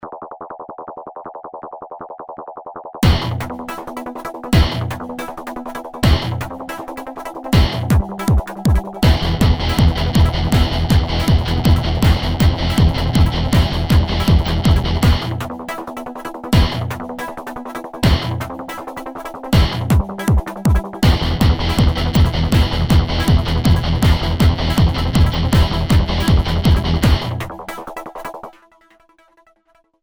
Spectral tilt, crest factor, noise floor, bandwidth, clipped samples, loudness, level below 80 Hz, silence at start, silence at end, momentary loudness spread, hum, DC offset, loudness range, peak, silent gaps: -6 dB/octave; 16 dB; -58 dBFS; over 20 kHz; under 0.1%; -17 LUFS; -22 dBFS; 0 s; 1.5 s; 16 LU; none; under 0.1%; 5 LU; 0 dBFS; none